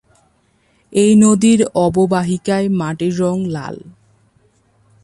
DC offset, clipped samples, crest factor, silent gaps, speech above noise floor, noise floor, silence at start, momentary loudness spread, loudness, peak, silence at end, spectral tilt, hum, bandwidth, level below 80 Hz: under 0.1%; under 0.1%; 16 dB; none; 44 dB; -58 dBFS; 0.9 s; 13 LU; -15 LUFS; 0 dBFS; 1.15 s; -6 dB/octave; none; 11.5 kHz; -50 dBFS